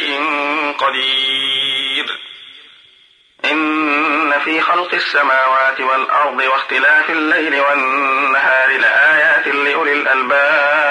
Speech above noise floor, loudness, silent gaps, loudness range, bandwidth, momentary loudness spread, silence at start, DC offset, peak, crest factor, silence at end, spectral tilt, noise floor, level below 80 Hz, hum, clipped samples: 36 dB; -13 LUFS; none; 5 LU; 10.5 kHz; 5 LU; 0 s; under 0.1%; -2 dBFS; 12 dB; 0 s; -2 dB/octave; -50 dBFS; -72 dBFS; none; under 0.1%